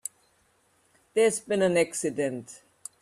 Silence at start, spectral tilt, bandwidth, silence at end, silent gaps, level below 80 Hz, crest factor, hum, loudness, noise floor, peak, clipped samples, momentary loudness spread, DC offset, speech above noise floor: 1.15 s; -4 dB/octave; 14.5 kHz; 0.45 s; none; -70 dBFS; 18 dB; none; -26 LUFS; -67 dBFS; -10 dBFS; under 0.1%; 19 LU; under 0.1%; 41 dB